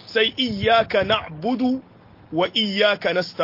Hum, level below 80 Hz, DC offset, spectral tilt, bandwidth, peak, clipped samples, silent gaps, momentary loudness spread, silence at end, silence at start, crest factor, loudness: none; -54 dBFS; under 0.1%; -5.5 dB/octave; 5.8 kHz; -4 dBFS; under 0.1%; none; 7 LU; 0 s; 0.05 s; 16 dB; -21 LUFS